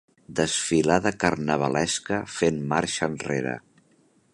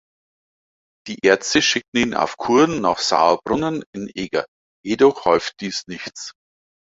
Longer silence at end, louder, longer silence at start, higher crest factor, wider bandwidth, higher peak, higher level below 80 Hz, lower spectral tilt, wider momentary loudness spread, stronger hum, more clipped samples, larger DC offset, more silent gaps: first, 0.75 s vs 0.5 s; second, -25 LUFS vs -19 LUFS; second, 0.3 s vs 1.05 s; about the same, 22 dB vs 18 dB; first, 11.5 kHz vs 8 kHz; about the same, -4 dBFS vs -2 dBFS; about the same, -54 dBFS vs -56 dBFS; about the same, -4 dB/octave vs -3.5 dB/octave; second, 7 LU vs 16 LU; neither; neither; neither; second, none vs 1.88-1.92 s, 3.86-3.93 s, 4.48-4.83 s